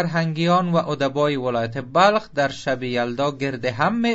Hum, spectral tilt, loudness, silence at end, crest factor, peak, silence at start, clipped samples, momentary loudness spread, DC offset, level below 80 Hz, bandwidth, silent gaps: none; -6 dB/octave; -21 LUFS; 0 s; 18 dB; -2 dBFS; 0 s; under 0.1%; 7 LU; under 0.1%; -56 dBFS; 8 kHz; none